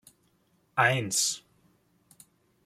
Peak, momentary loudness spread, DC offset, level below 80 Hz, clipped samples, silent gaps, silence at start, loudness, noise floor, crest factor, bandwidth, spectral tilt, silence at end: -8 dBFS; 10 LU; under 0.1%; -72 dBFS; under 0.1%; none; 0.75 s; -27 LUFS; -69 dBFS; 24 dB; 16 kHz; -2 dB/octave; 1.25 s